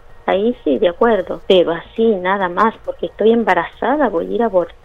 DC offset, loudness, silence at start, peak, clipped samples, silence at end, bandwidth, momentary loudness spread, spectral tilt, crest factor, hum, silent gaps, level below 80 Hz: under 0.1%; -16 LUFS; 0.25 s; 0 dBFS; under 0.1%; 0.15 s; 7.2 kHz; 5 LU; -7 dB/octave; 16 dB; none; none; -42 dBFS